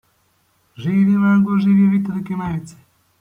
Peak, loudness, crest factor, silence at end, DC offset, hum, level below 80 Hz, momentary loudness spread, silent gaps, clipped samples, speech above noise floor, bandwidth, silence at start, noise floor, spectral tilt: -6 dBFS; -17 LUFS; 12 dB; 0.5 s; under 0.1%; none; -54 dBFS; 12 LU; none; under 0.1%; 45 dB; 7.6 kHz; 0.8 s; -62 dBFS; -9 dB/octave